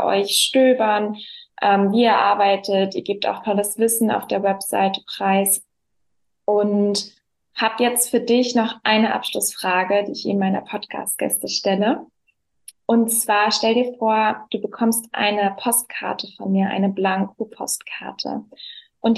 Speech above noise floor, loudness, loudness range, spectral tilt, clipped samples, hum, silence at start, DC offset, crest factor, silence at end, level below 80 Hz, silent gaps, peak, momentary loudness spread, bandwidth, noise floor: 57 dB; -20 LUFS; 3 LU; -3.5 dB/octave; under 0.1%; none; 0 s; under 0.1%; 16 dB; 0 s; -72 dBFS; none; -4 dBFS; 11 LU; 13 kHz; -77 dBFS